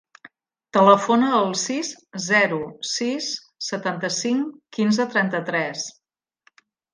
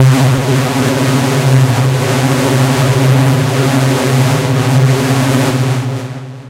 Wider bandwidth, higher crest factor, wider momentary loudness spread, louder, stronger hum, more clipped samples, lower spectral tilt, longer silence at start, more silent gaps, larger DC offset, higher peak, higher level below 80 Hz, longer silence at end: second, 10 kHz vs 16 kHz; first, 20 dB vs 10 dB; first, 13 LU vs 3 LU; second, -22 LUFS vs -11 LUFS; neither; neither; second, -3.5 dB/octave vs -6 dB/octave; first, 0.25 s vs 0 s; neither; neither; about the same, -2 dBFS vs 0 dBFS; second, -70 dBFS vs -42 dBFS; first, 1.05 s vs 0 s